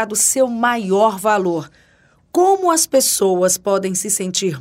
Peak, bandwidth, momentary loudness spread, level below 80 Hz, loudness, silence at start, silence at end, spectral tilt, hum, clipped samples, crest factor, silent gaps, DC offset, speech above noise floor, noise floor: -2 dBFS; 16.5 kHz; 5 LU; -60 dBFS; -16 LUFS; 0 s; 0 s; -3 dB/octave; none; under 0.1%; 14 dB; none; under 0.1%; 38 dB; -54 dBFS